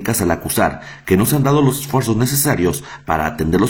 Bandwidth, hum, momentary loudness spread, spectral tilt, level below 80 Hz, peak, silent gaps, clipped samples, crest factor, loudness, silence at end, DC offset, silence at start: 19 kHz; none; 6 LU; -5 dB/octave; -40 dBFS; 0 dBFS; none; under 0.1%; 16 dB; -17 LUFS; 0 s; under 0.1%; 0 s